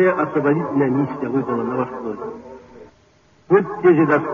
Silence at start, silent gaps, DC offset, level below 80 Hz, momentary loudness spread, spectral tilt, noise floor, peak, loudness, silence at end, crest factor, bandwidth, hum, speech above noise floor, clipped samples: 0 s; none; under 0.1%; -58 dBFS; 15 LU; -8 dB/octave; -54 dBFS; -2 dBFS; -19 LUFS; 0 s; 16 dB; 6.6 kHz; none; 36 dB; under 0.1%